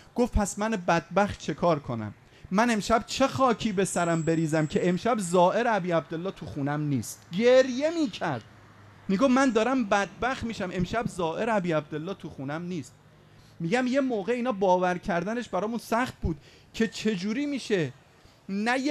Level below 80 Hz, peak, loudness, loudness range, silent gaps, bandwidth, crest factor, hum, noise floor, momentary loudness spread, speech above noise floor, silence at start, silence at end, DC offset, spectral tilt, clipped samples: -46 dBFS; -8 dBFS; -27 LUFS; 5 LU; none; 14 kHz; 18 dB; none; -54 dBFS; 12 LU; 28 dB; 0.15 s; 0 s; under 0.1%; -5.5 dB/octave; under 0.1%